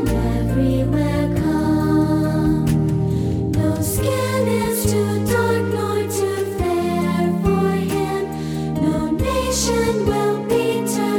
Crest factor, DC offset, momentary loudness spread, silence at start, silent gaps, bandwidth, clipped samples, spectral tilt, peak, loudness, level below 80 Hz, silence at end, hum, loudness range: 14 dB; under 0.1%; 3 LU; 0 s; none; 18.5 kHz; under 0.1%; -6 dB/octave; -6 dBFS; -19 LUFS; -32 dBFS; 0 s; none; 2 LU